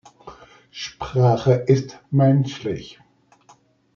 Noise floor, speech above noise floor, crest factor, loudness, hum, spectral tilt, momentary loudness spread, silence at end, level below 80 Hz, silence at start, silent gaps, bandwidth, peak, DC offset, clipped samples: -55 dBFS; 37 dB; 18 dB; -20 LUFS; none; -7.5 dB/octave; 16 LU; 1.05 s; -54 dBFS; 0.25 s; none; 7 kHz; -4 dBFS; under 0.1%; under 0.1%